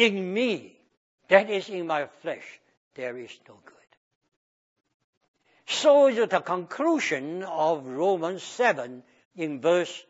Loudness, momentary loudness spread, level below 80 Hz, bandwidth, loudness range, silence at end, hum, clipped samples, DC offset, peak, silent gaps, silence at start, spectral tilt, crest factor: -25 LUFS; 15 LU; -84 dBFS; 8 kHz; 16 LU; 0.1 s; none; under 0.1%; under 0.1%; -4 dBFS; 0.97-1.18 s, 2.77-2.91 s, 3.97-4.21 s, 4.36-4.76 s, 4.94-5.21 s, 5.28-5.34 s, 9.25-9.31 s; 0 s; -4 dB/octave; 24 dB